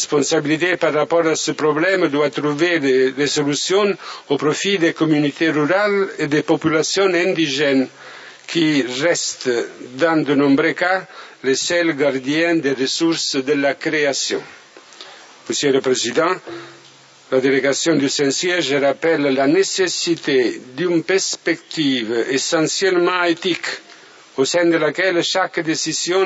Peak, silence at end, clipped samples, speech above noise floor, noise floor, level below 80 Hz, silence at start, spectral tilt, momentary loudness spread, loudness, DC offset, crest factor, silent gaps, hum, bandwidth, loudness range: -2 dBFS; 0 s; under 0.1%; 28 dB; -46 dBFS; -68 dBFS; 0 s; -3.5 dB/octave; 7 LU; -18 LUFS; under 0.1%; 16 dB; none; none; 8 kHz; 3 LU